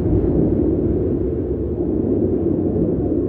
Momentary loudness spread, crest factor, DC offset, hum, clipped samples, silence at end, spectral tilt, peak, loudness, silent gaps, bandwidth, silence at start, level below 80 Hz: 4 LU; 12 dB; under 0.1%; none; under 0.1%; 0 s; -14 dB/octave; -6 dBFS; -19 LUFS; none; 3 kHz; 0 s; -30 dBFS